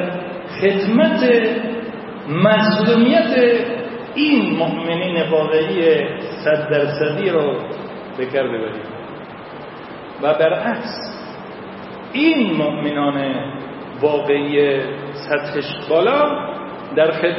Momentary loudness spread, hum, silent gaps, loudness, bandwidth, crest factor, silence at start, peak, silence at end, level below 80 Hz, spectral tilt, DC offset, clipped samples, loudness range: 17 LU; none; none; -18 LUFS; 5.8 kHz; 18 dB; 0 s; 0 dBFS; 0 s; -60 dBFS; -10 dB/octave; under 0.1%; under 0.1%; 7 LU